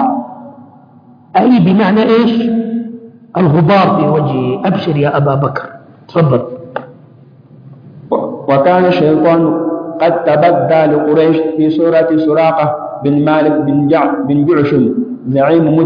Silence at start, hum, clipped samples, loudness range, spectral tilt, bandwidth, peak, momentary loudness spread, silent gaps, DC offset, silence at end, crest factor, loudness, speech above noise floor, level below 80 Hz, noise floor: 0 s; none; under 0.1%; 5 LU; -10 dB/octave; 5.2 kHz; 0 dBFS; 10 LU; none; under 0.1%; 0 s; 12 dB; -11 LUFS; 31 dB; -52 dBFS; -41 dBFS